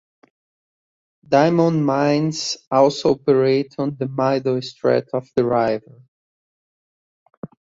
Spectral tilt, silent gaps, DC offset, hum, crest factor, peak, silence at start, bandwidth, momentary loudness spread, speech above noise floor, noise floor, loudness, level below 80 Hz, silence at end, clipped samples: -6 dB/octave; 2.67-2.71 s, 6.08-7.26 s, 7.37-7.42 s; under 0.1%; none; 18 dB; -2 dBFS; 1.3 s; 8 kHz; 9 LU; over 72 dB; under -90 dBFS; -19 LUFS; -60 dBFS; 0.3 s; under 0.1%